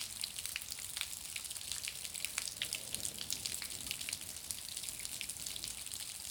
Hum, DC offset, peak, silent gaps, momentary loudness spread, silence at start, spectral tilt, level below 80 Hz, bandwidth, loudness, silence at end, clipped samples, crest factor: none; under 0.1%; -16 dBFS; none; 3 LU; 0 s; 0.5 dB/octave; -66 dBFS; over 20 kHz; -40 LUFS; 0 s; under 0.1%; 28 dB